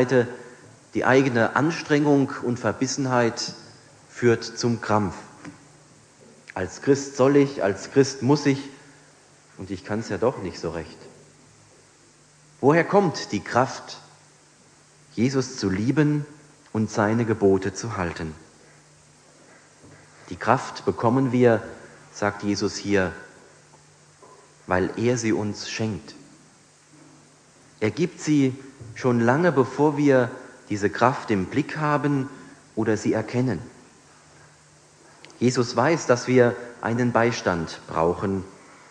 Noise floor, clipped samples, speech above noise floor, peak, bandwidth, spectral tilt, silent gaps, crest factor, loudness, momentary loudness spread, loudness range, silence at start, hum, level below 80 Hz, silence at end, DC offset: -55 dBFS; under 0.1%; 32 dB; -2 dBFS; 10 kHz; -6 dB/octave; none; 22 dB; -23 LUFS; 17 LU; 6 LU; 0 s; none; -58 dBFS; 0.4 s; under 0.1%